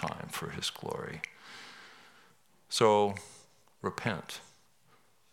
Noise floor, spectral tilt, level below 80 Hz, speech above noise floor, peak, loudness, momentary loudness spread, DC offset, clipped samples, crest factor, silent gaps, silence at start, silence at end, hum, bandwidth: -67 dBFS; -4 dB/octave; -72 dBFS; 36 dB; -10 dBFS; -33 LUFS; 23 LU; under 0.1%; under 0.1%; 26 dB; none; 0 s; 0.9 s; none; 17 kHz